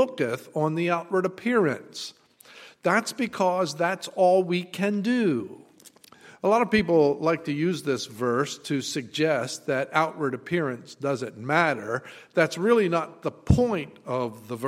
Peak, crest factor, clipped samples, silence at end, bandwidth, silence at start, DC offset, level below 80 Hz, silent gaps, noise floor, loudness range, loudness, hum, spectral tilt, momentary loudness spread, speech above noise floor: -6 dBFS; 20 dB; under 0.1%; 0 s; 16 kHz; 0 s; under 0.1%; -48 dBFS; none; -53 dBFS; 2 LU; -25 LUFS; none; -5.5 dB/octave; 10 LU; 28 dB